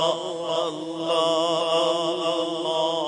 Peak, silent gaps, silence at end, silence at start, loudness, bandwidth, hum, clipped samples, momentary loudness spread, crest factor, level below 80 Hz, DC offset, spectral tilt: -8 dBFS; none; 0 s; 0 s; -24 LUFS; 10.5 kHz; none; under 0.1%; 6 LU; 16 dB; -72 dBFS; under 0.1%; -3.5 dB/octave